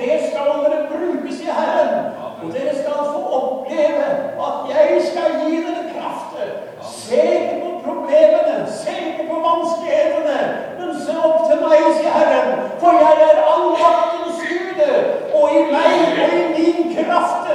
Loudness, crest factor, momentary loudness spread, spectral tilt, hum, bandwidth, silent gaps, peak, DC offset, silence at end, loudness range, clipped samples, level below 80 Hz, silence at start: -17 LUFS; 16 dB; 11 LU; -4.5 dB/octave; none; 11 kHz; none; 0 dBFS; under 0.1%; 0 s; 6 LU; under 0.1%; -66 dBFS; 0 s